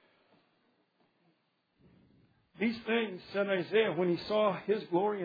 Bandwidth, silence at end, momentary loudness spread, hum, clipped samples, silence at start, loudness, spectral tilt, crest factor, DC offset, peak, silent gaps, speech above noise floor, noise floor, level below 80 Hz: 5 kHz; 0 s; 6 LU; none; under 0.1%; 2.55 s; -32 LUFS; -4 dB/octave; 18 dB; under 0.1%; -16 dBFS; none; 45 dB; -76 dBFS; -76 dBFS